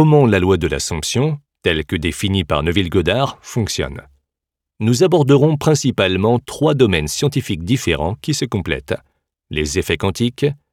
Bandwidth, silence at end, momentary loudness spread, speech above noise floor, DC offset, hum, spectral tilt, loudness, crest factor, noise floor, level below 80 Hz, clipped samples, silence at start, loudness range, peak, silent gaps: 16 kHz; 0.15 s; 9 LU; 67 dB; under 0.1%; none; -5.5 dB/octave; -17 LUFS; 16 dB; -83 dBFS; -38 dBFS; under 0.1%; 0 s; 5 LU; 0 dBFS; none